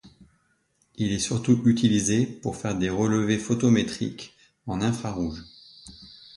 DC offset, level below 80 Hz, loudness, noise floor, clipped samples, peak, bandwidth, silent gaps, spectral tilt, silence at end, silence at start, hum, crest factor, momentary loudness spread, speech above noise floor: under 0.1%; -50 dBFS; -25 LUFS; -68 dBFS; under 0.1%; -8 dBFS; 11.5 kHz; none; -5.5 dB/octave; 0.25 s; 0.05 s; none; 18 dB; 23 LU; 44 dB